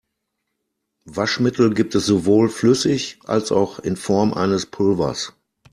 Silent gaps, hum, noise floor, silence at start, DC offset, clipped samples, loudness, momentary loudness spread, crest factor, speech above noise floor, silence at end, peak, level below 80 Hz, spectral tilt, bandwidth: none; none; -76 dBFS; 1.05 s; under 0.1%; under 0.1%; -19 LUFS; 8 LU; 18 dB; 58 dB; 0.45 s; -2 dBFS; -54 dBFS; -5.5 dB/octave; 13.5 kHz